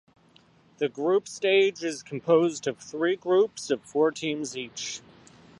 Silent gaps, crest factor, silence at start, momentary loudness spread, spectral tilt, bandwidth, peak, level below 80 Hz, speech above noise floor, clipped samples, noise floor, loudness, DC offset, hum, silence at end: none; 18 dB; 0.8 s; 11 LU; -4 dB/octave; 11.5 kHz; -10 dBFS; -74 dBFS; 33 dB; under 0.1%; -59 dBFS; -26 LUFS; under 0.1%; none; 0.6 s